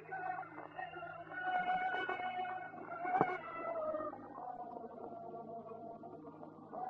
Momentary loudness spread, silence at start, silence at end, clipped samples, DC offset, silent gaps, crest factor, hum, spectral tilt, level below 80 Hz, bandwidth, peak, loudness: 14 LU; 0 s; 0 s; under 0.1%; under 0.1%; none; 28 dB; none; -7 dB/octave; -80 dBFS; 5.6 kHz; -14 dBFS; -42 LUFS